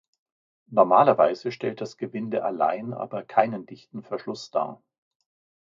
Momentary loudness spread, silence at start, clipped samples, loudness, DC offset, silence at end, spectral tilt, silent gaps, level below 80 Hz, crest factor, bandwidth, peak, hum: 16 LU; 0.7 s; under 0.1%; -25 LUFS; under 0.1%; 0.85 s; -6.5 dB/octave; none; -76 dBFS; 22 dB; 7.6 kHz; -4 dBFS; none